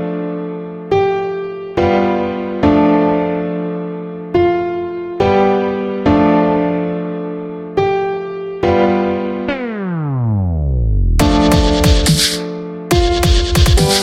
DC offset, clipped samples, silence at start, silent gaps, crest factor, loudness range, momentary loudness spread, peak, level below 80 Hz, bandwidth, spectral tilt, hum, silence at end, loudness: under 0.1%; under 0.1%; 0 s; none; 14 dB; 3 LU; 11 LU; 0 dBFS; -22 dBFS; 16.5 kHz; -5.5 dB/octave; none; 0 s; -15 LUFS